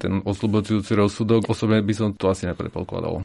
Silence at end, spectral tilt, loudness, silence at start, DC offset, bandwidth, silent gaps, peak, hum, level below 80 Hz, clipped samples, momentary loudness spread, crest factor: 0 s; -7 dB/octave; -22 LUFS; 0 s; under 0.1%; 11.5 kHz; none; -6 dBFS; none; -48 dBFS; under 0.1%; 8 LU; 16 dB